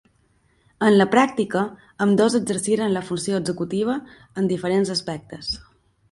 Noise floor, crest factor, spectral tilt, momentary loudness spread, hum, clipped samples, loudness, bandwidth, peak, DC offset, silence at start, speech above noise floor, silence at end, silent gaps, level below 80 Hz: -62 dBFS; 20 dB; -5 dB/octave; 12 LU; none; under 0.1%; -22 LUFS; 11.5 kHz; -2 dBFS; under 0.1%; 0.8 s; 41 dB; 0.5 s; none; -56 dBFS